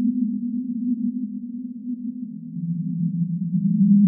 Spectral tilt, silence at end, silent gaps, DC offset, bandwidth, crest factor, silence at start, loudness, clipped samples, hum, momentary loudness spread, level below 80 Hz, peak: -17 dB/octave; 0 s; none; under 0.1%; 0.5 kHz; 14 dB; 0 s; -25 LUFS; under 0.1%; none; 10 LU; -76 dBFS; -8 dBFS